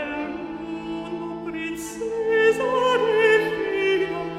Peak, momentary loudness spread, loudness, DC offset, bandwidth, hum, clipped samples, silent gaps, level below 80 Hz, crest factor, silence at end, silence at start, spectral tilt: -6 dBFS; 13 LU; -23 LUFS; under 0.1%; 14.5 kHz; none; under 0.1%; none; -56 dBFS; 16 dB; 0 s; 0 s; -4.5 dB/octave